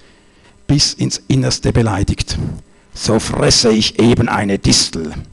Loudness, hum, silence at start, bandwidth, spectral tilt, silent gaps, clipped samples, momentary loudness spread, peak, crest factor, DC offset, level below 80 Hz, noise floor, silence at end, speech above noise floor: -14 LUFS; none; 0.7 s; 12.5 kHz; -4.5 dB/octave; none; under 0.1%; 11 LU; -4 dBFS; 12 dB; under 0.1%; -30 dBFS; -47 dBFS; 0.05 s; 32 dB